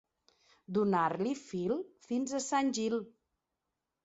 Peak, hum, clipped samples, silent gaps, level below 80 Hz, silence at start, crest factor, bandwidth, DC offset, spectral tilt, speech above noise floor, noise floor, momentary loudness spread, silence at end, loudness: -18 dBFS; none; under 0.1%; none; -76 dBFS; 0.7 s; 18 dB; 8.2 kHz; under 0.1%; -5 dB/octave; 54 dB; -87 dBFS; 8 LU; 0.95 s; -34 LUFS